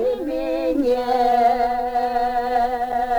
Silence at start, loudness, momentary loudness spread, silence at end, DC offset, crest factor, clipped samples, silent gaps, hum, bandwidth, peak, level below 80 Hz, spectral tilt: 0 s; -20 LUFS; 6 LU; 0 s; under 0.1%; 12 dB; under 0.1%; none; none; over 20 kHz; -8 dBFS; -42 dBFS; -5 dB/octave